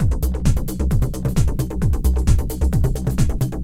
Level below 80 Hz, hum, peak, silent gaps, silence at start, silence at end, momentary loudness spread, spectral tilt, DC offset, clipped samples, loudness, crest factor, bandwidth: -20 dBFS; none; -4 dBFS; none; 0 s; 0 s; 2 LU; -7 dB/octave; 3%; under 0.1%; -21 LUFS; 14 dB; 16.5 kHz